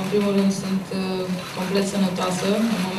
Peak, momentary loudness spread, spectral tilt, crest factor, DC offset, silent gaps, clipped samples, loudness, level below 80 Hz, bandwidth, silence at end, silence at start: -8 dBFS; 6 LU; -5.5 dB/octave; 14 dB; under 0.1%; none; under 0.1%; -23 LUFS; -58 dBFS; 14.5 kHz; 0 s; 0 s